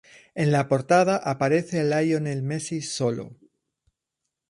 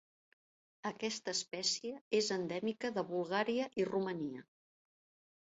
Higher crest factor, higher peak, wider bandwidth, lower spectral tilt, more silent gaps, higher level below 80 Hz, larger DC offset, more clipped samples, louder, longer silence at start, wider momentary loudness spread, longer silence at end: about the same, 18 dB vs 18 dB; first, -8 dBFS vs -22 dBFS; first, 11.5 kHz vs 8 kHz; first, -6 dB/octave vs -3 dB/octave; second, none vs 2.01-2.11 s; first, -64 dBFS vs -80 dBFS; neither; neither; first, -24 LUFS vs -37 LUFS; second, 0.35 s vs 0.85 s; about the same, 10 LU vs 8 LU; first, 1.15 s vs 1 s